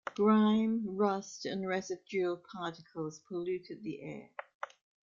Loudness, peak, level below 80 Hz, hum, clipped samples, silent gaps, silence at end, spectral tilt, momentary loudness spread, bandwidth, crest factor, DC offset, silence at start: -34 LUFS; -18 dBFS; -76 dBFS; none; under 0.1%; 4.54-4.61 s; 0.4 s; -6 dB/octave; 18 LU; 7.4 kHz; 16 dB; under 0.1%; 0.05 s